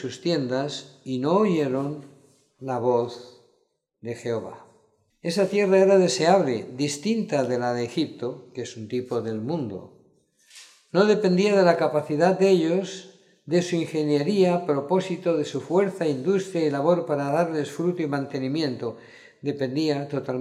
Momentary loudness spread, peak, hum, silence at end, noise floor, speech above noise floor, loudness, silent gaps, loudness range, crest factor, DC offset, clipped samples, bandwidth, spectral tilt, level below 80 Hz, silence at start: 14 LU; -4 dBFS; none; 0 s; -70 dBFS; 47 dB; -24 LUFS; none; 7 LU; 20 dB; under 0.1%; under 0.1%; 12.5 kHz; -6 dB/octave; -74 dBFS; 0 s